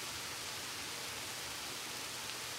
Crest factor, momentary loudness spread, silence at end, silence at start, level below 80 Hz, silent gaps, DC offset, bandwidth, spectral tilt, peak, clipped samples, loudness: 22 dB; 0 LU; 0 s; 0 s; -68 dBFS; none; under 0.1%; 16 kHz; -0.5 dB/octave; -22 dBFS; under 0.1%; -41 LUFS